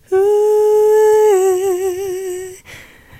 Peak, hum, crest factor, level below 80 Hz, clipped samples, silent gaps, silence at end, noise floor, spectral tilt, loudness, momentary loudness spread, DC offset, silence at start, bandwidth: -4 dBFS; none; 10 dB; -52 dBFS; under 0.1%; none; 0.4 s; -39 dBFS; -4 dB/octave; -13 LUFS; 14 LU; under 0.1%; 0.1 s; 15 kHz